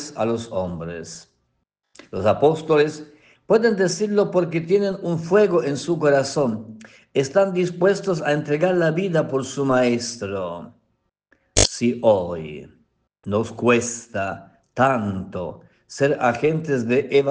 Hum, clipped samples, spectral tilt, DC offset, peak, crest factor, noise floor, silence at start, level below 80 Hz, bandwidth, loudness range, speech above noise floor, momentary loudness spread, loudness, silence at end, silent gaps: none; under 0.1%; -5 dB/octave; under 0.1%; -2 dBFS; 20 dB; -73 dBFS; 0 s; -46 dBFS; 10 kHz; 4 LU; 53 dB; 14 LU; -21 LUFS; 0 s; none